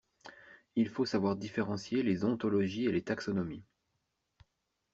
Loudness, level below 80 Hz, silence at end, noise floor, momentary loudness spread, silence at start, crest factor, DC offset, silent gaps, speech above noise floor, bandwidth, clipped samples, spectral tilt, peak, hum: -34 LUFS; -70 dBFS; 1.3 s; -83 dBFS; 15 LU; 0.25 s; 18 dB; under 0.1%; none; 50 dB; 7.8 kHz; under 0.1%; -6 dB/octave; -18 dBFS; none